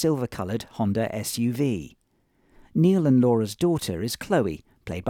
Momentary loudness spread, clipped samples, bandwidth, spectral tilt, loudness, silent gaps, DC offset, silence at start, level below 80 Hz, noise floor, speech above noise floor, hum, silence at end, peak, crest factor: 11 LU; under 0.1%; 18 kHz; -6.5 dB/octave; -24 LUFS; none; under 0.1%; 0 s; -56 dBFS; -66 dBFS; 43 dB; none; 0 s; -10 dBFS; 14 dB